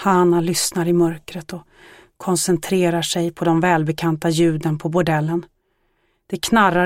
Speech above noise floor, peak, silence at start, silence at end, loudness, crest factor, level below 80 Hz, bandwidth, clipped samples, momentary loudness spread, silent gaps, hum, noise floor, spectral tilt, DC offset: 47 dB; -2 dBFS; 0 s; 0 s; -19 LUFS; 16 dB; -52 dBFS; 16.5 kHz; under 0.1%; 15 LU; none; none; -66 dBFS; -5 dB/octave; under 0.1%